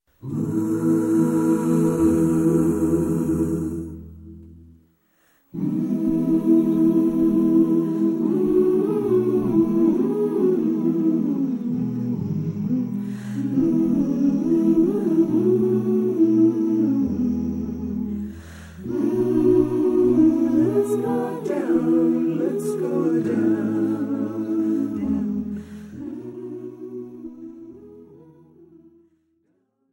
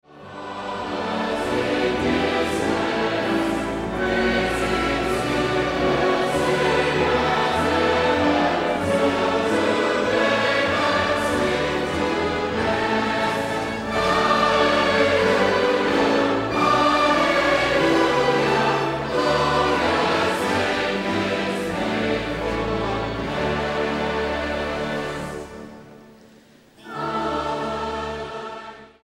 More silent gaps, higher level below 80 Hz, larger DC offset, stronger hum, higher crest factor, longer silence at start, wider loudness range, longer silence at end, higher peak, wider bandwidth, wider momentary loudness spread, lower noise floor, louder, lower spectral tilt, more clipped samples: neither; second, -50 dBFS vs -42 dBFS; neither; neither; about the same, 14 dB vs 16 dB; first, 0.25 s vs 0.1 s; about the same, 8 LU vs 8 LU; first, 1.9 s vs 0.2 s; about the same, -6 dBFS vs -6 dBFS; about the same, 16 kHz vs 16 kHz; first, 16 LU vs 9 LU; first, -68 dBFS vs -51 dBFS; about the same, -21 LUFS vs -21 LUFS; first, -9 dB/octave vs -5 dB/octave; neither